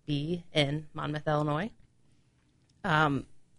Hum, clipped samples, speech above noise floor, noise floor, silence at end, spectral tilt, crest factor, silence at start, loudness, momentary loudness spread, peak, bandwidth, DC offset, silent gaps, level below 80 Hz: none; under 0.1%; 37 dB; -67 dBFS; 0.15 s; -6.5 dB/octave; 20 dB; 0.1 s; -31 LUFS; 10 LU; -12 dBFS; 10.5 kHz; under 0.1%; none; -58 dBFS